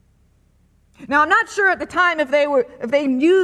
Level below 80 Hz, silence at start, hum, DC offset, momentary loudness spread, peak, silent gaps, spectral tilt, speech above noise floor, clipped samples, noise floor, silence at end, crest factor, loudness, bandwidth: -56 dBFS; 1 s; none; under 0.1%; 5 LU; -4 dBFS; none; -3.5 dB/octave; 40 dB; under 0.1%; -57 dBFS; 0 s; 14 dB; -17 LUFS; 11 kHz